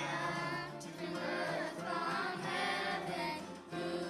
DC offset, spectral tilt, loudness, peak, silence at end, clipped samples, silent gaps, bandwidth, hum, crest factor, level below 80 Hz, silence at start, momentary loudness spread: under 0.1%; -4.5 dB/octave; -38 LUFS; -24 dBFS; 0 s; under 0.1%; none; 16 kHz; none; 14 dB; -72 dBFS; 0 s; 8 LU